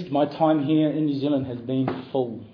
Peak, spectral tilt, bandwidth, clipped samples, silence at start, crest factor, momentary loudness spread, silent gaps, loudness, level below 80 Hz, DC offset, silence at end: -8 dBFS; -10 dB/octave; 5.2 kHz; under 0.1%; 0 s; 14 dB; 7 LU; none; -24 LUFS; -64 dBFS; under 0.1%; 0.05 s